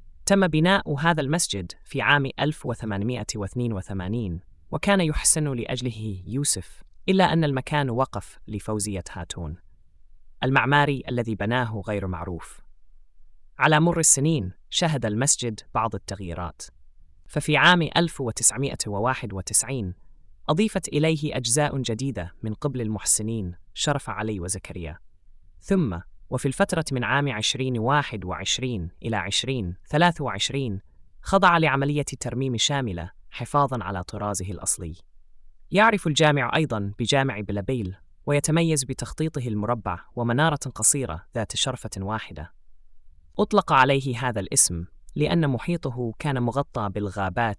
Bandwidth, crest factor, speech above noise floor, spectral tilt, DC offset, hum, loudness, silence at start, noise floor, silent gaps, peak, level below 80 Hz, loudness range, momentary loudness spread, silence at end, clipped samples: 12 kHz; 22 dB; 25 dB; -4 dB/octave; under 0.1%; none; -24 LUFS; 0 s; -49 dBFS; none; -4 dBFS; -46 dBFS; 4 LU; 14 LU; 0.05 s; under 0.1%